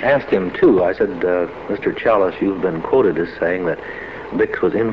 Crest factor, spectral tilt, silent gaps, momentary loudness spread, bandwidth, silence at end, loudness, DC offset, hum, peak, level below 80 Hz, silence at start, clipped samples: 16 dB; -8.5 dB/octave; none; 9 LU; 6 kHz; 0 s; -18 LUFS; 0.3%; none; -2 dBFS; -46 dBFS; 0 s; under 0.1%